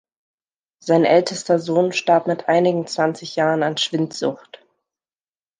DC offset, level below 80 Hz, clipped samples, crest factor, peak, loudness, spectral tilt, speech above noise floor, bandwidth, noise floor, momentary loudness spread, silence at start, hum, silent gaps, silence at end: under 0.1%; -72 dBFS; under 0.1%; 18 dB; -2 dBFS; -19 LUFS; -5 dB/octave; over 71 dB; 9.8 kHz; under -90 dBFS; 8 LU; 0.85 s; none; none; 1.25 s